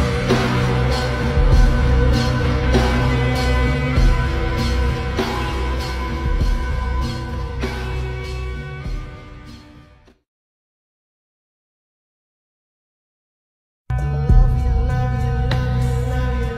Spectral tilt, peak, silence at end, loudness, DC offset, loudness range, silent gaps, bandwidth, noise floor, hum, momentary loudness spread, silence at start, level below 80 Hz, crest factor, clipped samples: -6.5 dB/octave; -2 dBFS; 0 s; -20 LUFS; under 0.1%; 14 LU; 10.28-13.85 s; 12.5 kHz; -48 dBFS; none; 11 LU; 0 s; -22 dBFS; 18 dB; under 0.1%